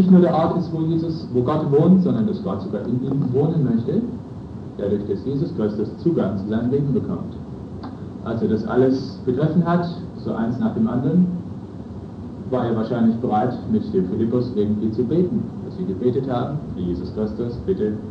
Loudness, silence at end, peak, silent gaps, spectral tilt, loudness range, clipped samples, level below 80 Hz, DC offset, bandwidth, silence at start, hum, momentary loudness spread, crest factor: -21 LUFS; 0 s; -4 dBFS; none; -10.5 dB/octave; 4 LU; under 0.1%; -46 dBFS; under 0.1%; 6.2 kHz; 0 s; none; 14 LU; 18 dB